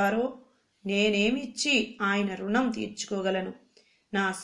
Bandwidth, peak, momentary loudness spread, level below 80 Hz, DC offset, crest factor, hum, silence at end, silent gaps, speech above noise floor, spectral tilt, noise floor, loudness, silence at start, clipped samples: 12 kHz; -12 dBFS; 9 LU; -62 dBFS; under 0.1%; 16 dB; none; 0 s; none; 36 dB; -4 dB/octave; -63 dBFS; -28 LUFS; 0 s; under 0.1%